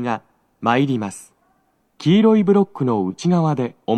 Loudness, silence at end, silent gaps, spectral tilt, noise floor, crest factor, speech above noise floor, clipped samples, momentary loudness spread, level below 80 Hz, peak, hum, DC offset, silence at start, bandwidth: -18 LUFS; 0 s; none; -7 dB/octave; -63 dBFS; 16 dB; 46 dB; under 0.1%; 12 LU; -70 dBFS; -2 dBFS; none; under 0.1%; 0 s; 11.5 kHz